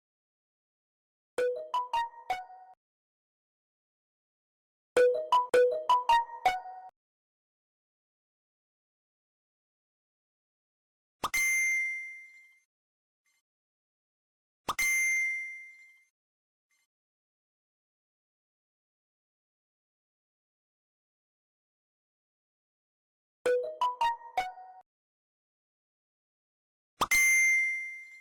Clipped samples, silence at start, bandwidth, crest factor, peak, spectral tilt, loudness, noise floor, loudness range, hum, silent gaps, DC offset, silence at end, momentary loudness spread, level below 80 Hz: under 0.1%; 1.4 s; 17.5 kHz; 16 dB; -18 dBFS; 0 dB/octave; -28 LUFS; -54 dBFS; 11 LU; none; 2.77-4.96 s, 6.96-11.20 s, 12.65-13.25 s, 13.41-14.65 s, 16.10-16.70 s, 16.85-23.45 s, 24.86-26.97 s; under 0.1%; 0 s; 16 LU; -70 dBFS